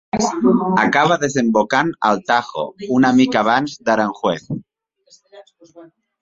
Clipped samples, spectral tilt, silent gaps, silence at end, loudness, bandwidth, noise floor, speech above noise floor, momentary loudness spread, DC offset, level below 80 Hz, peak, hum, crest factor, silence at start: under 0.1%; -5 dB/octave; none; 0.35 s; -17 LUFS; 7.8 kHz; -54 dBFS; 37 dB; 10 LU; under 0.1%; -56 dBFS; 0 dBFS; none; 16 dB; 0.15 s